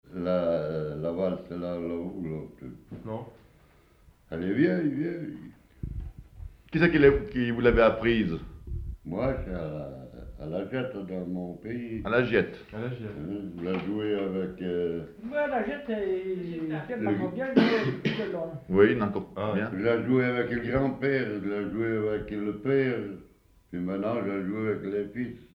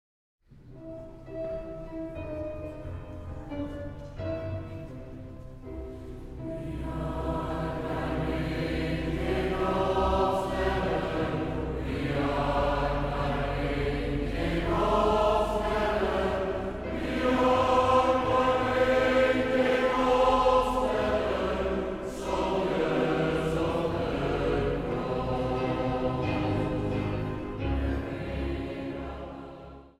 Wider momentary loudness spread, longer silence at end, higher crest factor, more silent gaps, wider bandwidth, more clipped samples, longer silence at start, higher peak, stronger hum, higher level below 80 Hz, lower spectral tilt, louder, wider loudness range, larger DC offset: about the same, 16 LU vs 17 LU; about the same, 0.1 s vs 0.1 s; about the same, 22 dB vs 18 dB; neither; second, 6.4 kHz vs 14 kHz; neither; second, 0.05 s vs 0.5 s; first, -6 dBFS vs -12 dBFS; neither; second, -46 dBFS vs -40 dBFS; first, -8.5 dB/octave vs -6.5 dB/octave; about the same, -29 LUFS vs -28 LUFS; second, 8 LU vs 14 LU; neither